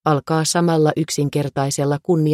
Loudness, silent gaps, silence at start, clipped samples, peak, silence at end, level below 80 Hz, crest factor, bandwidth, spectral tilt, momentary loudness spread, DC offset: -19 LUFS; none; 0.05 s; under 0.1%; -4 dBFS; 0 s; -58 dBFS; 14 dB; 15 kHz; -5.5 dB/octave; 4 LU; under 0.1%